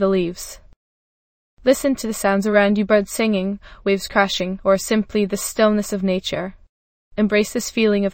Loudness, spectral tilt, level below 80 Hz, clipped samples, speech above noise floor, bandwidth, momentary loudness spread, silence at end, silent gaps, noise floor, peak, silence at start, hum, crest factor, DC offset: -19 LUFS; -4.5 dB/octave; -46 dBFS; under 0.1%; over 71 dB; 16.5 kHz; 10 LU; 0 s; 0.76-1.57 s, 6.69-7.11 s; under -90 dBFS; -2 dBFS; 0 s; none; 18 dB; under 0.1%